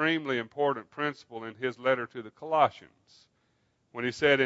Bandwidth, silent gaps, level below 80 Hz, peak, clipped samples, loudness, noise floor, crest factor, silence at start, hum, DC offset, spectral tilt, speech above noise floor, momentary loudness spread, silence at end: 8 kHz; none; -72 dBFS; -8 dBFS; under 0.1%; -30 LUFS; -72 dBFS; 22 dB; 0 s; none; under 0.1%; -5.5 dB/octave; 43 dB; 15 LU; 0 s